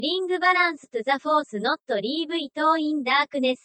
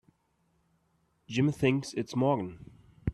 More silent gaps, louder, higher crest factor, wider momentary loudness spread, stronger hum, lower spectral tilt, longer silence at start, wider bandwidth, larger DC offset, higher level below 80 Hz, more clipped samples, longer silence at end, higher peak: neither; first, -23 LUFS vs -30 LUFS; about the same, 18 dB vs 20 dB; second, 6 LU vs 10 LU; neither; second, -4 dB/octave vs -6.5 dB/octave; second, 0 s vs 1.3 s; second, 8.8 kHz vs 12.5 kHz; neither; second, -82 dBFS vs -54 dBFS; neither; about the same, 0.1 s vs 0 s; first, -6 dBFS vs -12 dBFS